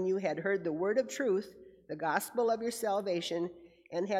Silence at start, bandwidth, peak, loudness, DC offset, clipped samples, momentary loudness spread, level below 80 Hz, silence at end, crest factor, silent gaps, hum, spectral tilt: 0 s; 16 kHz; -14 dBFS; -33 LUFS; under 0.1%; under 0.1%; 8 LU; -76 dBFS; 0 s; 18 dB; none; none; -4.5 dB/octave